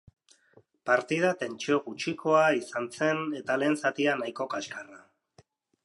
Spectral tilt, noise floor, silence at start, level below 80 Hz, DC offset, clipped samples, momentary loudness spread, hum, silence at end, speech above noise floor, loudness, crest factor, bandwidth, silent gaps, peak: -4.5 dB/octave; -63 dBFS; 0.85 s; -76 dBFS; under 0.1%; under 0.1%; 12 LU; none; 0.85 s; 35 dB; -28 LUFS; 20 dB; 11.5 kHz; none; -10 dBFS